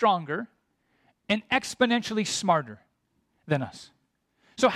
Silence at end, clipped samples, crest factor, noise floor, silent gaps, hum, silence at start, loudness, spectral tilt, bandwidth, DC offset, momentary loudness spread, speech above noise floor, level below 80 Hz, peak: 0 s; under 0.1%; 20 dB; -73 dBFS; none; none; 0 s; -27 LUFS; -4 dB/octave; 14.5 kHz; under 0.1%; 19 LU; 47 dB; -66 dBFS; -8 dBFS